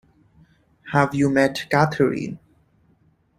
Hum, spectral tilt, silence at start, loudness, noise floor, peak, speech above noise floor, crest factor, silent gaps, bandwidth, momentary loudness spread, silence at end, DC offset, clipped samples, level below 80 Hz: none; -6.5 dB/octave; 0.85 s; -20 LUFS; -61 dBFS; -2 dBFS; 41 dB; 22 dB; none; 15.5 kHz; 12 LU; 1 s; under 0.1%; under 0.1%; -56 dBFS